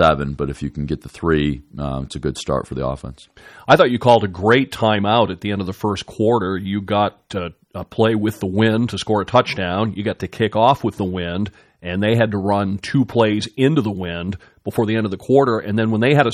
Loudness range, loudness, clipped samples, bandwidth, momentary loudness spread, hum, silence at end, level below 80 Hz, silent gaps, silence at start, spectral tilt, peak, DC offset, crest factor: 4 LU; -19 LUFS; under 0.1%; 15 kHz; 11 LU; none; 0 s; -42 dBFS; none; 0 s; -6.5 dB/octave; 0 dBFS; under 0.1%; 18 dB